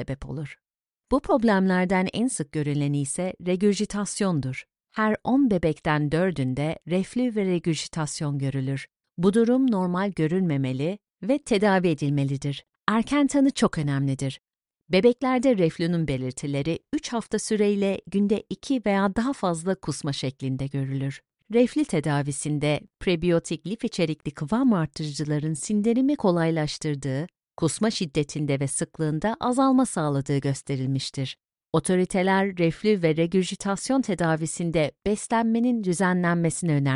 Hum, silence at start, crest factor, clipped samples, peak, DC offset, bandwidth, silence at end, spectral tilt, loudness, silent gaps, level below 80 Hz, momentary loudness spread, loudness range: none; 0 s; 22 dB; under 0.1%; -4 dBFS; under 0.1%; 11.5 kHz; 0 s; -6 dB/octave; -25 LUFS; none; -52 dBFS; 8 LU; 2 LU